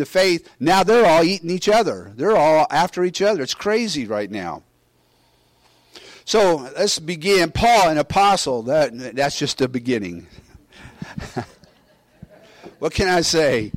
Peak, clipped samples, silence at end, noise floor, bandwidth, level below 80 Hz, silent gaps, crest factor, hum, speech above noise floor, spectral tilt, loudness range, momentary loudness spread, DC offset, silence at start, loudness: -8 dBFS; under 0.1%; 0.05 s; -60 dBFS; 16.5 kHz; -46 dBFS; none; 12 dB; none; 42 dB; -4 dB/octave; 9 LU; 16 LU; under 0.1%; 0 s; -18 LUFS